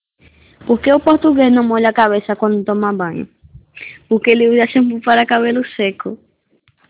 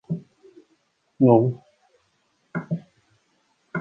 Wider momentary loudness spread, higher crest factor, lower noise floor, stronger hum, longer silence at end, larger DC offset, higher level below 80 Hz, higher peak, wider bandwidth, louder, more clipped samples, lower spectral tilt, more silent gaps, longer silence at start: about the same, 17 LU vs 17 LU; second, 14 dB vs 22 dB; second, -58 dBFS vs -68 dBFS; neither; first, 0.75 s vs 0 s; neither; first, -52 dBFS vs -66 dBFS; first, 0 dBFS vs -4 dBFS; about the same, 4 kHz vs 3.9 kHz; first, -14 LUFS vs -23 LUFS; neither; second, -9.5 dB/octave vs -11.5 dB/octave; neither; first, 0.65 s vs 0.1 s